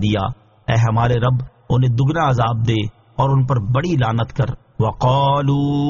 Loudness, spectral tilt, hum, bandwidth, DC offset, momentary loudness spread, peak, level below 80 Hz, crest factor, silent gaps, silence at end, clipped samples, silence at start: -18 LUFS; -6.5 dB/octave; none; 7.2 kHz; under 0.1%; 7 LU; -4 dBFS; -38 dBFS; 14 dB; none; 0 s; under 0.1%; 0 s